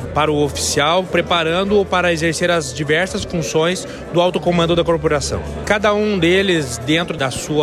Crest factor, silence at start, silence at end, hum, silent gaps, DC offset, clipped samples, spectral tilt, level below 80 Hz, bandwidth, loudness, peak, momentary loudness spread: 14 dB; 0 s; 0 s; none; none; under 0.1%; under 0.1%; -4.5 dB/octave; -36 dBFS; 15 kHz; -17 LUFS; -2 dBFS; 5 LU